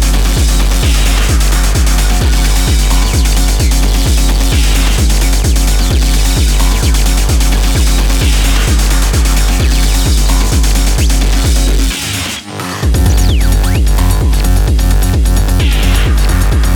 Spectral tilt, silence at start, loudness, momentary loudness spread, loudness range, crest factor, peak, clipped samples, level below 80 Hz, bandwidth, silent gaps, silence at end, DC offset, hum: -4 dB/octave; 0 s; -12 LUFS; 1 LU; 1 LU; 8 dB; 0 dBFS; under 0.1%; -10 dBFS; 19 kHz; none; 0 s; under 0.1%; none